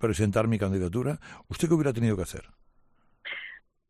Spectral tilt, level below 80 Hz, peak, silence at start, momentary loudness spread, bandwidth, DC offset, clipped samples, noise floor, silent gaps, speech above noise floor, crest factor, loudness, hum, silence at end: -6.5 dB/octave; -52 dBFS; -10 dBFS; 0 s; 16 LU; 14 kHz; under 0.1%; under 0.1%; -63 dBFS; none; 36 dB; 18 dB; -28 LUFS; none; 0.3 s